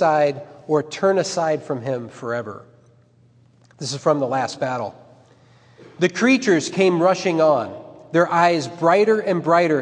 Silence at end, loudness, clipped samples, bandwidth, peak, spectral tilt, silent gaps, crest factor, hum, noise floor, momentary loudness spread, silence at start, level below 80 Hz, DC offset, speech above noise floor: 0 s; -20 LUFS; under 0.1%; 10 kHz; -2 dBFS; -5 dB/octave; none; 18 dB; none; -54 dBFS; 12 LU; 0 s; -72 dBFS; under 0.1%; 35 dB